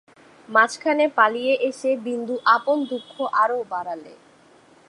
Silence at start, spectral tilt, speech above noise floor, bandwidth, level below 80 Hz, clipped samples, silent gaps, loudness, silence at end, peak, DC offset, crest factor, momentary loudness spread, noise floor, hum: 0.5 s; -3 dB/octave; 31 dB; 11.5 kHz; -76 dBFS; under 0.1%; none; -21 LUFS; 0.75 s; -2 dBFS; under 0.1%; 20 dB; 11 LU; -53 dBFS; none